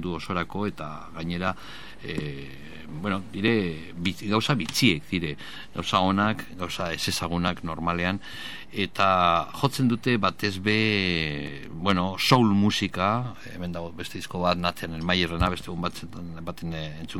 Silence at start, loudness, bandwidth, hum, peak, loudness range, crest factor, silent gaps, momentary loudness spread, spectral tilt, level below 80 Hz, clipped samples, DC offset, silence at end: 0 s; -26 LUFS; 17 kHz; none; -4 dBFS; 5 LU; 22 dB; none; 15 LU; -5 dB/octave; -48 dBFS; under 0.1%; 0.9%; 0 s